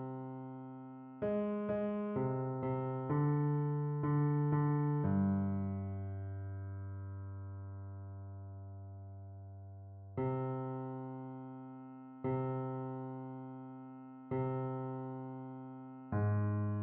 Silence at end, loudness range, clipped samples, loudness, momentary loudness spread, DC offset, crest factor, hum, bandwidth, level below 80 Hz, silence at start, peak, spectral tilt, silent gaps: 0 s; 12 LU; under 0.1%; -38 LUFS; 17 LU; under 0.1%; 16 dB; none; 3.4 kHz; -70 dBFS; 0 s; -22 dBFS; -10.5 dB/octave; none